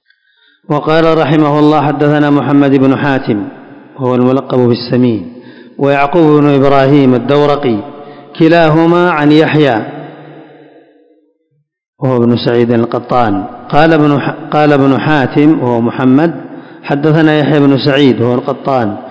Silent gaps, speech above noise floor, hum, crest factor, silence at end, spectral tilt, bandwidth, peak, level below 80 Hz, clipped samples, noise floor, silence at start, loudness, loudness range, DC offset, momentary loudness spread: 11.88-11.93 s; 52 dB; none; 10 dB; 0 s; -8.5 dB/octave; 8 kHz; 0 dBFS; -46 dBFS; 2%; -61 dBFS; 0.7 s; -10 LUFS; 5 LU; under 0.1%; 10 LU